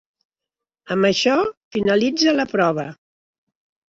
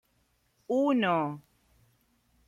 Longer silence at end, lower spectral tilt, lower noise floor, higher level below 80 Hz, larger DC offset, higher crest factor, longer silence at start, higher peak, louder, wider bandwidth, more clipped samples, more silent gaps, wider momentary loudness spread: about the same, 1 s vs 1.1 s; second, -4.5 dB/octave vs -7 dB/octave; first, -87 dBFS vs -72 dBFS; first, -60 dBFS vs -72 dBFS; neither; about the same, 18 dB vs 18 dB; first, 0.9 s vs 0.7 s; first, -4 dBFS vs -14 dBFS; first, -19 LUFS vs -28 LUFS; second, 7.8 kHz vs 11.5 kHz; neither; first, 1.57-1.71 s vs none; second, 9 LU vs 12 LU